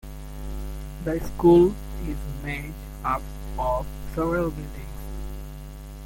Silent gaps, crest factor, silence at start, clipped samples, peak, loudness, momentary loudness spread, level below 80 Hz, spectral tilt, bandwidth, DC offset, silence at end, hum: none; 20 dB; 0.05 s; under 0.1%; -6 dBFS; -25 LUFS; 20 LU; -36 dBFS; -7.5 dB/octave; 17 kHz; under 0.1%; 0 s; none